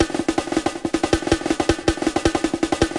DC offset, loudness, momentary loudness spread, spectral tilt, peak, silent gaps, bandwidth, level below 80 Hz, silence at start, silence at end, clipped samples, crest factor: 0.2%; -21 LUFS; 3 LU; -4.5 dB/octave; -2 dBFS; none; 11.5 kHz; -36 dBFS; 0 s; 0 s; under 0.1%; 18 dB